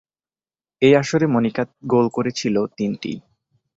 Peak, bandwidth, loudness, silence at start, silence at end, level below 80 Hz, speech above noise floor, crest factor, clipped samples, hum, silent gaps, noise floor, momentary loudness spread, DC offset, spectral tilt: -2 dBFS; 8 kHz; -20 LUFS; 0.8 s; 0.6 s; -60 dBFS; over 71 dB; 18 dB; under 0.1%; none; none; under -90 dBFS; 12 LU; under 0.1%; -6 dB/octave